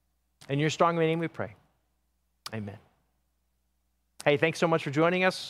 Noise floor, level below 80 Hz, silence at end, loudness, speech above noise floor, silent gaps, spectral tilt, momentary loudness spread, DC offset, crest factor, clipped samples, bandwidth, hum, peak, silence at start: -75 dBFS; -72 dBFS; 0 s; -27 LUFS; 49 dB; none; -5.5 dB/octave; 15 LU; under 0.1%; 22 dB; under 0.1%; 15.5 kHz; none; -8 dBFS; 0.5 s